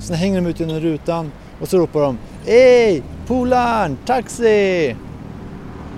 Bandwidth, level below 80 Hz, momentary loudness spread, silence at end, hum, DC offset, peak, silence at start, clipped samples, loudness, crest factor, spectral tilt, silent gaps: 14.5 kHz; -38 dBFS; 21 LU; 0 s; none; under 0.1%; 0 dBFS; 0 s; under 0.1%; -16 LUFS; 16 dB; -6 dB/octave; none